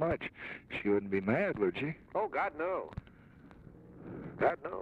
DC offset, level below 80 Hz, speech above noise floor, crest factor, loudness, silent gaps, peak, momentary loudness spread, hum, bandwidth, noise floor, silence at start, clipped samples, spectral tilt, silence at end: under 0.1%; -60 dBFS; 22 dB; 18 dB; -34 LUFS; none; -16 dBFS; 17 LU; none; 5.4 kHz; -56 dBFS; 0 s; under 0.1%; -8.5 dB/octave; 0 s